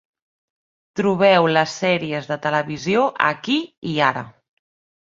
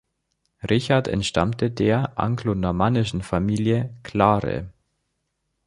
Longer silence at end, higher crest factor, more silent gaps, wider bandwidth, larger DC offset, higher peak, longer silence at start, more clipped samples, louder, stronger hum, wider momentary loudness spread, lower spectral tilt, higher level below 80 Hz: second, 0.75 s vs 0.95 s; about the same, 20 dB vs 22 dB; first, 3.78-3.82 s vs none; second, 7.8 kHz vs 11.5 kHz; neither; about the same, -2 dBFS vs -2 dBFS; first, 0.95 s vs 0.65 s; neither; first, -19 LUFS vs -22 LUFS; neither; first, 11 LU vs 8 LU; second, -5 dB/octave vs -6.5 dB/octave; second, -62 dBFS vs -44 dBFS